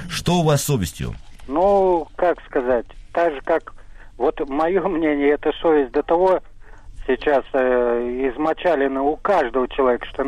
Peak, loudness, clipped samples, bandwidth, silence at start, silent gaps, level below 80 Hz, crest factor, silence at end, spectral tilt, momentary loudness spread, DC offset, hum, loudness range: -8 dBFS; -20 LUFS; under 0.1%; 14.5 kHz; 0 s; none; -40 dBFS; 12 dB; 0 s; -5.5 dB/octave; 6 LU; under 0.1%; none; 2 LU